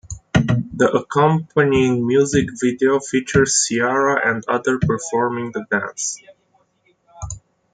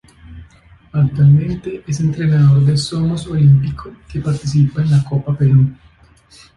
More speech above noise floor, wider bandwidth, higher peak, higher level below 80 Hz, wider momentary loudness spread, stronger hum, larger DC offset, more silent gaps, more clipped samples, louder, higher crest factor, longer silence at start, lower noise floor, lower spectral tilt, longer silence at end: first, 44 dB vs 33 dB; second, 9.4 kHz vs 10.5 kHz; about the same, -2 dBFS vs -2 dBFS; about the same, -44 dBFS vs -40 dBFS; about the same, 10 LU vs 12 LU; neither; neither; neither; neither; second, -18 LUFS vs -15 LUFS; about the same, 16 dB vs 12 dB; second, 0.1 s vs 0.3 s; first, -62 dBFS vs -47 dBFS; second, -4.5 dB/octave vs -7.5 dB/octave; second, 0.35 s vs 0.85 s